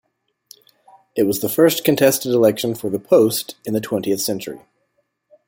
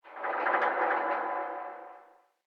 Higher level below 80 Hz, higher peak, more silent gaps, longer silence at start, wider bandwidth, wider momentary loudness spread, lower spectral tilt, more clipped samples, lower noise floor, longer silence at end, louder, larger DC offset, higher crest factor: first, -60 dBFS vs under -90 dBFS; first, -2 dBFS vs -12 dBFS; neither; first, 1.15 s vs 0.05 s; first, 17 kHz vs 6.4 kHz; second, 11 LU vs 16 LU; about the same, -4.5 dB/octave vs -4 dB/octave; neither; first, -69 dBFS vs -58 dBFS; first, 0.9 s vs 0.5 s; first, -18 LUFS vs -30 LUFS; neither; about the same, 18 dB vs 20 dB